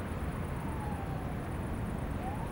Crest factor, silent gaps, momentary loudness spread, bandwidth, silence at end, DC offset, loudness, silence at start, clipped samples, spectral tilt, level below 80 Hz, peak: 12 dB; none; 1 LU; 19.5 kHz; 0 s; under 0.1%; -38 LUFS; 0 s; under 0.1%; -7.5 dB/octave; -42 dBFS; -24 dBFS